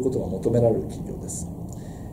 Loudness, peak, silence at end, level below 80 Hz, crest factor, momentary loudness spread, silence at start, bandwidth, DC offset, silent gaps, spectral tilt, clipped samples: -26 LUFS; -8 dBFS; 0 s; -42 dBFS; 18 dB; 15 LU; 0 s; 16 kHz; under 0.1%; none; -7.5 dB/octave; under 0.1%